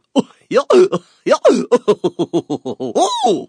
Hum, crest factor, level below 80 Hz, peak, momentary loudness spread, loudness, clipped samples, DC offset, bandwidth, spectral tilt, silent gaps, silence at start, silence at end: none; 14 dB; -68 dBFS; 0 dBFS; 9 LU; -16 LUFS; under 0.1%; under 0.1%; 10 kHz; -5 dB/octave; none; 0.15 s; 0.05 s